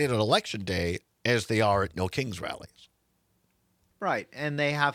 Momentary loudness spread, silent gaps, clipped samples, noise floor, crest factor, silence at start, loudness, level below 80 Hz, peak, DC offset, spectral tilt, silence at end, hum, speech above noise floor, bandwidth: 10 LU; none; under 0.1%; -72 dBFS; 22 dB; 0 s; -28 LUFS; -58 dBFS; -8 dBFS; under 0.1%; -5 dB/octave; 0 s; none; 44 dB; 16 kHz